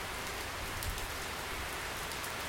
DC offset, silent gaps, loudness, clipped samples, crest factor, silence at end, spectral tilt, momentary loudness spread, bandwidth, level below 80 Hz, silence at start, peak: under 0.1%; none; -38 LUFS; under 0.1%; 24 dB; 0 s; -2.5 dB/octave; 1 LU; 17 kHz; -48 dBFS; 0 s; -16 dBFS